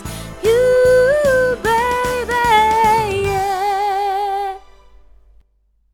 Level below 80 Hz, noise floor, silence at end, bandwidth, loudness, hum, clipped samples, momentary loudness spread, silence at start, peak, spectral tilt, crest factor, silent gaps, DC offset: -38 dBFS; -60 dBFS; 1.35 s; 18.5 kHz; -15 LUFS; none; under 0.1%; 9 LU; 0 s; -2 dBFS; -4 dB/octave; 14 dB; none; under 0.1%